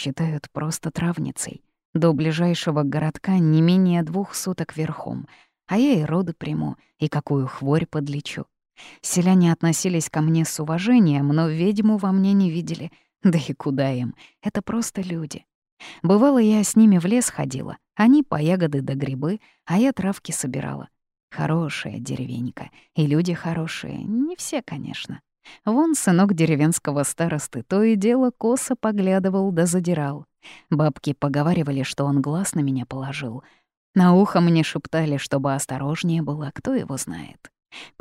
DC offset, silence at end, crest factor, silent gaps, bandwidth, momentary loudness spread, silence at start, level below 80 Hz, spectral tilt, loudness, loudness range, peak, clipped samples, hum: under 0.1%; 0.15 s; 16 dB; 1.85-1.93 s, 15.55-15.62 s, 15.72-15.77 s, 21.23-21.28 s, 33.77-33.93 s; 15.5 kHz; 14 LU; 0 s; -58 dBFS; -6 dB/octave; -22 LUFS; 6 LU; -6 dBFS; under 0.1%; none